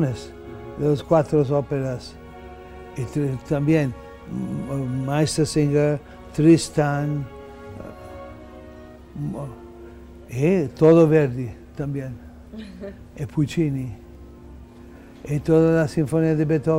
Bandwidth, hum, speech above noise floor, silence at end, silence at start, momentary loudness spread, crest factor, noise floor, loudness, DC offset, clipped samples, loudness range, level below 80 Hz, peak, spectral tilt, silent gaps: 13.5 kHz; none; 23 dB; 0 s; 0 s; 23 LU; 18 dB; -43 dBFS; -21 LUFS; under 0.1%; under 0.1%; 8 LU; -46 dBFS; -4 dBFS; -7 dB/octave; none